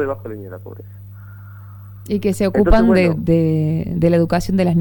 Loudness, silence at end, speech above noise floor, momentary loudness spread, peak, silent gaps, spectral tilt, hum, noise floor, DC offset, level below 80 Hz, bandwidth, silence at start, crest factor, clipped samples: -16 LUFS; 0 s; 20 dB; 24 LU; -2 dBFS; none; -8 dB/octave; 50 Hz at -35 dBFS; -36 dBFS; under 0.1%; -28 dBFS; 18.5 kHz; 0 s; 14 dB; under 0.1%